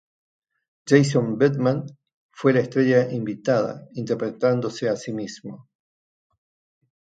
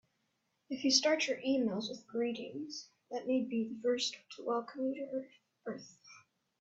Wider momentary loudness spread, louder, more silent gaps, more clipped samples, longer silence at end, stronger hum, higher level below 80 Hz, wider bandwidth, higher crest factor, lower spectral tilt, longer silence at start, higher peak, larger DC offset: about the same, 15 LU vs 16 LU; first, -22 LUFS vs -35 LUFS; first, 2.14-2.29 s vs none; neither; first, 1.45 s vs 0.4 s; neither; first, -68 dBFS vs -82 dBFS; first, 9.2 kHz vs 8 kHz; about the same, 22 dB vs 26 dB; first, -6.5 dB/octave vs -2.5 dB/octave; first, 0.85 s vs 0.7 s; first, -2 dBFS vs -12 dBFS; neither